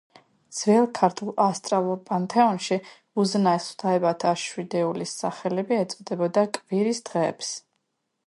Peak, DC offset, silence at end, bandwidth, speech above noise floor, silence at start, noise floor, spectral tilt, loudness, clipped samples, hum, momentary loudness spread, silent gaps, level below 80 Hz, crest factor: -4 dBFS; under 0.1%; 0.65 s; 11.5 kHz; 53 dB; 0.5 s; -77 dBFS; -5 dB/octave; -25 LUFS; under 0.1%; none; 8 LU; none; -74 dBFS; 20 dB